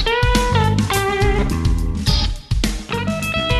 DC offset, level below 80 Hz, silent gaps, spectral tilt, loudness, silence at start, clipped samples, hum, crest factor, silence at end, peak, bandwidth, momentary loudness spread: under 0.1%; -22 dBFS; none; -5 dB/octave; -19 LUFS; 0 s; under 0.1%; none; 14 dB; 0 s; -2 dBFS; 13.5 kHz; 6 LU